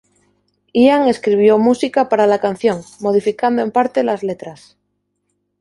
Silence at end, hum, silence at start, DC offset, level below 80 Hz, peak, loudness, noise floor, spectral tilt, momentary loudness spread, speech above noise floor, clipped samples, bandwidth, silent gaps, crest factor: 1.05 s; 50 Hz at -45 dBFS; 0.75 s; under 0.1%; -60 dBFS; -2 dBFS; -15 LUFS; -70 dBFS; -6 dB/octave; 10 LU; 55 dB; under 0.1%; 11.5 kHz; none; 14 dB